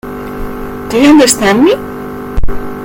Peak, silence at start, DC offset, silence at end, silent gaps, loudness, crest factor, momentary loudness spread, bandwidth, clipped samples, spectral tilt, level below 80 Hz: 0 dBFS; 0.05 s; under 0.1%; 0 s; none; -9 LUFS; 10 dB; 17 LU; over 20 kHz; 0.7%; -4 dB/octave; -22 dBFS